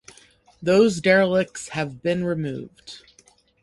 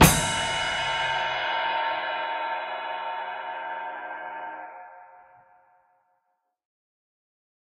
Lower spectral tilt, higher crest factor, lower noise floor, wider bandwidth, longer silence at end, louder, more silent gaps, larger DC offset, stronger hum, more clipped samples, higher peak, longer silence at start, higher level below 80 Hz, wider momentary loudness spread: first, -5.5 dB/octave vs -3 dB/octave; second, 20 dB vs 26 dB; second, -58 dBFS vs -76 dBFS; second, 11.5 kHz vs 15.5 kHz; second, 0.65 s vs 2.4 s; first, -21 LUFS vs -27 LUFS; neither; neither; neither; neither; about the same, -4 dBFS vs -2 dBFS; first, 0.6 s vs 0 s; second, -58 dBFS vs -44 dBFS; first, 23 LU vs 12 LU